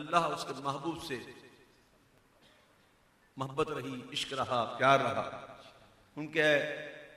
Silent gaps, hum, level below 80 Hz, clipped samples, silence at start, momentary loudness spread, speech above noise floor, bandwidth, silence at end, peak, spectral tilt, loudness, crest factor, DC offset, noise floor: none; none; -68 dBFS; under 0.1%; 0 s; 21 LU; 34 dB; 15.5 kHz; 0 s; -12 dBFS; -4.5 dB/octave; -33 LUFS; 24 dB; under 0.1%; -67 dBFS